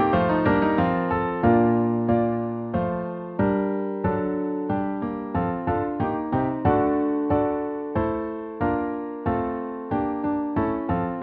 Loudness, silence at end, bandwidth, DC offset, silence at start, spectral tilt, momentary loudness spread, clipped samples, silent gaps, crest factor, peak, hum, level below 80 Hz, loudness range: -24 LUFS; 0 s; 4.8 kHz; under 0.1%; 0 s; -7.5 dB/octave; 7 LU; under 0.1%; none; 18 dB; -4 dBFS; none; -44 dBFS; 4 LU